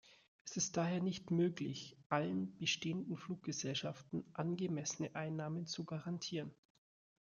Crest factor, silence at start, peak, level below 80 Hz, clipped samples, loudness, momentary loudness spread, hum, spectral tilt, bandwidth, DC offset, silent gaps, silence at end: 22 dB; 0.05 s; -20 dBFS; -78 dBFS; under 0.1%; -41 LUFS; 8 LU; none; -4.5 dB/octave; 7.4 kHz; under 0.1%; 0.28-0.45 s, 2.06-2.10 s; 0.65 s